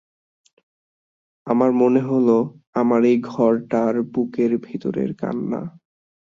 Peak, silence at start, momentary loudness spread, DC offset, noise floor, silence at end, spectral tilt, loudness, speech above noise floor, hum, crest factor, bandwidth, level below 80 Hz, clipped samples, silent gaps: -4 dBFS; 1.45 s; 10 LU; under 0.1%; under -90 dBFS; 0.65 s; -9 dB/octave; -20 LUFS; over 71 dB; none; 18 dB; 7.2 kHz; -64 dBFS; under 0.1%; 2.67-2.73 s